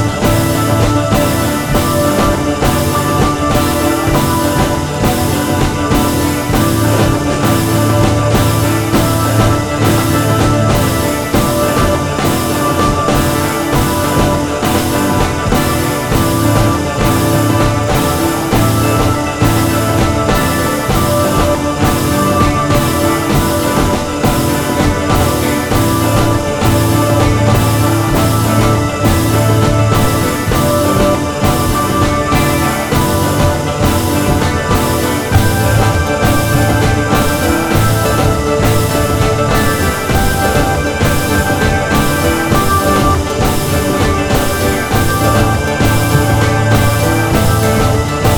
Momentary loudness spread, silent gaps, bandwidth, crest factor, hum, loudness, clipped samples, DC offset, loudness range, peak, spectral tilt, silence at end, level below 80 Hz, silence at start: 2 LU; none; over 20 kHz; 12 dB; none; -12 LUFS; under 0.1%; under 0.1%; 1 LU; 0 dBFS; -5.5 dB/octave; 0 s; -24 dBFS; 0 s